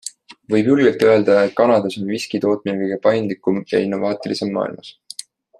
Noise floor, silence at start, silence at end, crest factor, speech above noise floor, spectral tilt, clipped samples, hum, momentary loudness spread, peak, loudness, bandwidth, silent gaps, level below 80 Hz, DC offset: -38 dBFS; 0.05 s; 0.7 s; 16 dB; 20 dB; -6 dB/octave; under 0.1%; none; 19 LU; -2 dBFS; -18 LUFS; 13 kHz; none; -64 dBFS; under 0.1%